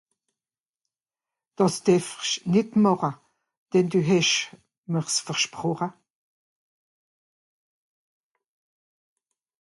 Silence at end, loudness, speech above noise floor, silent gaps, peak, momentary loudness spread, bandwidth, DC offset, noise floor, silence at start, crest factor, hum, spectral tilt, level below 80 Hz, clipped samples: 3.7 s; -24 LUFS; over 67 dB; 3.57-3.66 s, 4.78-4.83 s; -8 dBFS; 10 LU; 11.5 kHz; under 0.1%; under -90 dBFS; 1.6 s; 20 dB; none; -4.5 dB/octave; -70 dBFS; under 0.1%